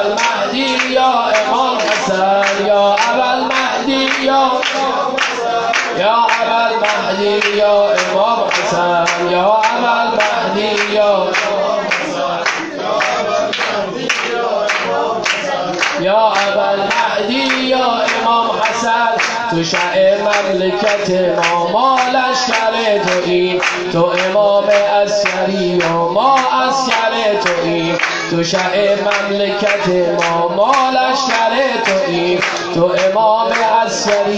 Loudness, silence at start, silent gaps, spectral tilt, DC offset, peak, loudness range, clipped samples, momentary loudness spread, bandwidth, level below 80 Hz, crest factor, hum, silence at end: -14 LUFS; 0 s; none; -3.5 dB/octave; under 0.1%; 0 dBFS; 2 LU; under 0.1%; 4 LU; 9 kHz; -52 dBFS; 14 dB; none; 0 s